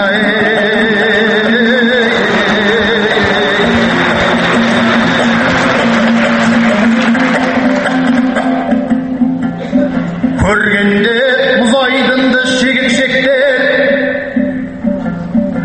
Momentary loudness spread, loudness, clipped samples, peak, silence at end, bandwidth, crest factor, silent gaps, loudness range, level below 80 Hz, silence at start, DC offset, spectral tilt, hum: 5 LU; -10 LUFS; under 0.1%; 0 dBFS; 0 s; 8.8 kHz; 10 dB; none; 2 LU; -36 dBFS; 0 s; under 0.1%; -5 dB/octave; none